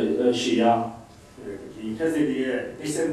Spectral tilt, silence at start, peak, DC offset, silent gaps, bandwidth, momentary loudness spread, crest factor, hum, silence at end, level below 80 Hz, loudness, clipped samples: -5 dB/octave; 0 s; -8 dBFS; under 0.1%; none; 14 kHz; 17 LU; 16 dB; none; 0 s; -58 dBFS; -24 LUFS; under 0.1%